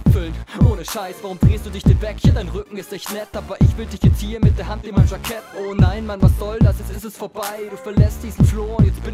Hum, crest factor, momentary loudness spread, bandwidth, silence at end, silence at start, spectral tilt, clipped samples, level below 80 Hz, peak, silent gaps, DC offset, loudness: none; 16 dB; 12 LU; 15.5 kHz; 0 s; 0 s; -7.5 dB/octave; under 0.1%; -24 dBFS; 0 dBFS; none; under 0.1%; -19 LUFS